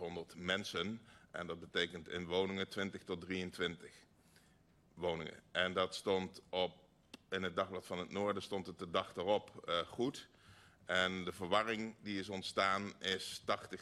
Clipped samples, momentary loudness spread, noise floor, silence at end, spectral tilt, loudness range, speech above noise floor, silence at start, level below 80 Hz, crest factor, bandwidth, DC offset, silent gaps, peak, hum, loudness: under 0.1%; 10 LU; -69 dBFS; 0 s; -4 dB/octave; 3 LU; 29 dB; 0 s; -74 dBFS; 22 dB; 13 kHz; under 0.1%; none; -20 dBFS; none; -40 LUFS